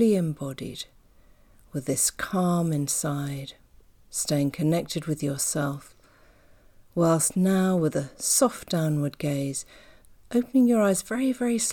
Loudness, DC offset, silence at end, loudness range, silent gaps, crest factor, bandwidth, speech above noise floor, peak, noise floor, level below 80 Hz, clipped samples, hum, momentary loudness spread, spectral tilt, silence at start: -25 LUFS; under 0.1%; 0 s; 4 LU; none; 18 dB; 19 kHz; 31 dB; -10 dBFS; -56 dBFS; -58 dBFS; under 0.1%; none; 13 LU; -5 dB/octave; 0 s